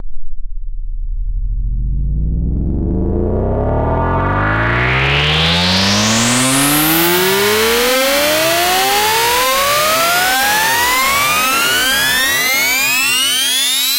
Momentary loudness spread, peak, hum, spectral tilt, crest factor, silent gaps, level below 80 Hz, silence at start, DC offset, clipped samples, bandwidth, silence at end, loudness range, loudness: 10 LU; -2 dBFS; none; -2.5 dB/octave; 12 dB; none; -24 dBFS; 0 s; under 0.1%; under 0.1%; 16 kHz; 0 s; 7 LU; -12 LUFS